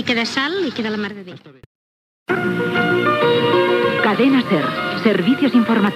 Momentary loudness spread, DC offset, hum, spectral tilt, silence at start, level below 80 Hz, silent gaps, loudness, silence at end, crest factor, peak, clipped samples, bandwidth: 9 LU; under 0.1%; none; -6 dB/octave; 0 s; -62 dBFS; 1.66-2.26 s; -17 LUFS; 0 s; 16 dB; 0 dBFS; under 0.1%; 14 kHz